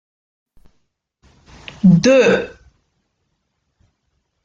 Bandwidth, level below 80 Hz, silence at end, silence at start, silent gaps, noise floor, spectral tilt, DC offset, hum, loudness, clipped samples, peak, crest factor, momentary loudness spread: 7.6 kHz; -52 dBFS; 1.95 s; 1.85 s; none; -70 dBFS; -6.5 dB/octave; under 0.1%; none; -13 LUFS; under 0.1%; -2 dBFS; 18 dB; 26 LU